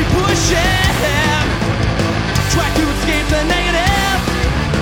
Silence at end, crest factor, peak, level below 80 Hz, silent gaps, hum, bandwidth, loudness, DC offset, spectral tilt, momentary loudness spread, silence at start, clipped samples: 0 s; 14 dB; 0 dBFS; -22 dBFS; none; none; 19.5 kHz; -15 LUFS; under 0.1%; -4.5 dB/octave; 3 LU; 0 s; under 0.1%